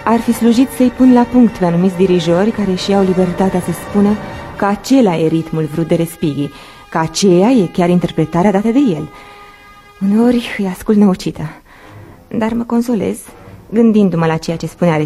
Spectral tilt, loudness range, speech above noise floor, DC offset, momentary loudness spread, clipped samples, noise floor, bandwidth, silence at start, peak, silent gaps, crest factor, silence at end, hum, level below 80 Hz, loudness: -6.5 dB/octave; 4 LU; 27 dB; under 0.1%; 10 LU; under 0.1%; -40 dBFS; 14.5 kHz; 0 s; 0 dBFS; none; 14 dB; 0 s; none; -42 dBFS; -13 LUFS